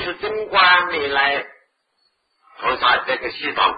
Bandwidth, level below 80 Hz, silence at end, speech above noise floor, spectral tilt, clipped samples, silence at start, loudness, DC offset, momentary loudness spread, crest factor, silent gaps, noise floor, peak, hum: 5 kHz; -54 dBFS; 0 s; 48 dB; -6 dB/octave; under 0.1%; 0 s; -18 LUFS; under 0.1%; 12 LU; 18 dB; none; -67 dBFS; -2 dBFS; none